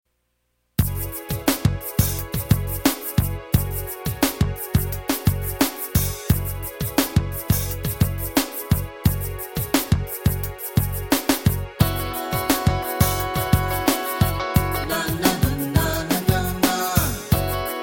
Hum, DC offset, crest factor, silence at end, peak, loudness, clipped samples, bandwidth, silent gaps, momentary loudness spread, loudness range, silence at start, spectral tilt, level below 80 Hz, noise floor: none; under 0.1%; 20 dB; 0 s; -2 dBFS; -22 LUFS; under 0.1%; 17 kHz; none; 5 LU; 2 LU; 0.8 s; -5 dB/octave; -32 dBFS; -71 dBFS